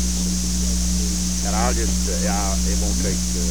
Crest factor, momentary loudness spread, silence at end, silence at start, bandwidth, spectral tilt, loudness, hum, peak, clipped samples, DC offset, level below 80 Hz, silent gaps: 14 dB; 2 LU; 0 s; 0 s; over 20 kHz; -4 dB/octave; -21 LUFS; 60 Hz at -25 dBFS; -8 dBFS; under 0.1%; 3%; -24 dBFS; none